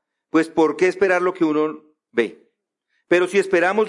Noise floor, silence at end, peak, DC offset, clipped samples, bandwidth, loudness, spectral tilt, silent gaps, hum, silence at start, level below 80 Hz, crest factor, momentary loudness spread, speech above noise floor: -72 dBFS; 0 s; -6 dBFS; under 0.1%; under 0.1%; 11.5 kHz; -20 LUFS; -5.5 dB/octave; none; none; 0.35 s; -66 dBFS; 16 dB; 8 LU; 54 dB